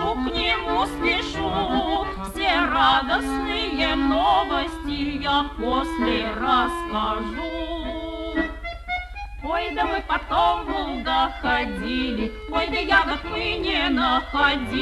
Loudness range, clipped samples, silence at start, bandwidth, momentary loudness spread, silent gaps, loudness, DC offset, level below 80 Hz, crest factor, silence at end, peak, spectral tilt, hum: 5 LU; under 0.1%; 0 s; 13 kHz; 10 LU; none; -23 LUFS; under 0.1%; -36 dBFS; 18 dB; 0 s; -6 dBFS; -5 dB/octave; none